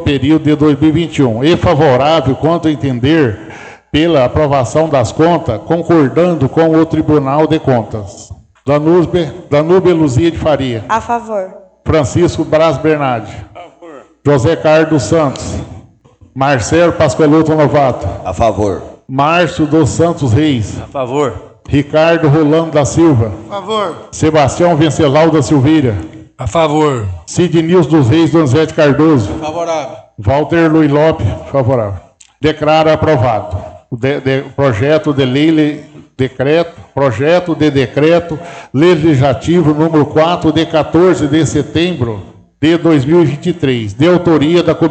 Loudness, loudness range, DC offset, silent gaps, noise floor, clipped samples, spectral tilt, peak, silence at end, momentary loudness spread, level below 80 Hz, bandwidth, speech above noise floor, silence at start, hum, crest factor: -11 LUFS; 2 LU; under 0.1%; none; -44 dBFS; under 0.1%; -6.5 dB/octave; 0 dBFS; 0 s; 10 LU; -36 dBFS; 9 kHz; 33 dB; 0 s; none; 10 dB